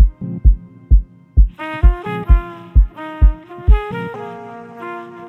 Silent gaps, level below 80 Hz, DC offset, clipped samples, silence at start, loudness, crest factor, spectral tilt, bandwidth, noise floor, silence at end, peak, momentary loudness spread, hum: none; -14 dBFS; under 0.1%; under 0.1%; 0 s; -18 LUFS; 14 dB; -9.5 dB/octave; 3.7 kHz; -33 dBFS; 0 s; 0 dBFS; 13 LU; none